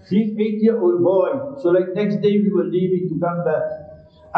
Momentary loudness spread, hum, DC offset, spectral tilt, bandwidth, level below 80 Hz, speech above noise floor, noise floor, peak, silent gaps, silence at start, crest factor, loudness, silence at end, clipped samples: 6 LU; none; under 0.1%; -10 dB/octave; 5.4 kHz; -60 dBFS; 25 dB; -43 dBFS; -6 dBFS; none; 0.1 s; 12 dB; -19 LUFS; 0 s; under 0.1%